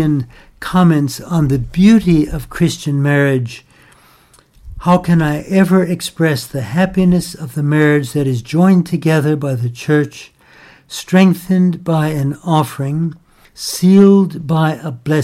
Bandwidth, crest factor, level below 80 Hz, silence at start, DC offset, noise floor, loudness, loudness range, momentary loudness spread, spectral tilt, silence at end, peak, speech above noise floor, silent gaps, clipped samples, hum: 15 kHz; 14 dB; -38 dBFS; 0 s; under 0.1%; -49 dBFS; -14 LUFS; 2 LU; 10 LU; -7 dB/octave; 0 s; 0 dBFS; 35 dB; none; under 0.1%; none